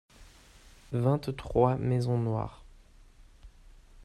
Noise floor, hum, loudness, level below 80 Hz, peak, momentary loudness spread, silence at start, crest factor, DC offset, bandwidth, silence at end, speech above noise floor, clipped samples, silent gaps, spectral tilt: -55 dBFS; none; -30 LUFS; -50 dBFS; -10 dBFS; 9 LU; 0.2 s; 22 dB; under 0.1%; 12 kHz; 0 s; 27 dB; under 0.1%; none; -8.5 dB/octave